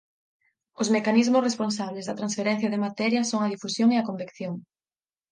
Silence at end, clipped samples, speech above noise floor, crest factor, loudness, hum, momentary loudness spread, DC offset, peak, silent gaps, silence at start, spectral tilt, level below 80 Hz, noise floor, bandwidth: 0.7 s; under 0.1%; over 65 dB; 18 dB; -25 LUFS; none; 13 LU; under 0.1%; -8 dBFS; none; 0.8 s; -4.5 dB/octave; -76 dBFS; under -90 dBFS; 9.8 kHz